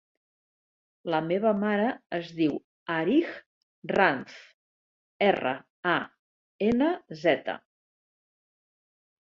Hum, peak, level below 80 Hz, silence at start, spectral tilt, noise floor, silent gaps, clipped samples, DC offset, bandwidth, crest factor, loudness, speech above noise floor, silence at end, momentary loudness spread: none; -6 dBFS; -66 dBFS; 1.05 s; -7 dB/octave; under -90 dBFS; 2.06-2.10 s, 2.64-2.86 s, 3.46-3.82 s, 4.54-5.20 s, 5.70-5.83 s, 6.19-6.59 s; under 0.1%; under 0.1%; 7.4 kHz; 24 dB; -27 LUFS; over 63 dB; 1.7 s; 13 LU